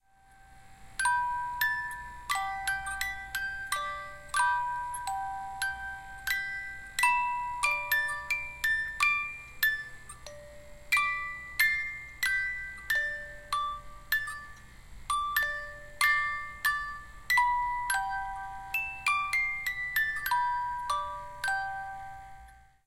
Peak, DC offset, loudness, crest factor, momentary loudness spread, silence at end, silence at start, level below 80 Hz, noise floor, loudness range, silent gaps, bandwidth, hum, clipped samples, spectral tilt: -10 dBFS; under 0.1%; -30 LUFS; 22 dB; 14 LU; 0.25 s; 0.45 s; -54 dBFS; -58 dBFS; 4 LU; none; 16.5 kHz; none; under 0.1%; 0 dB/octave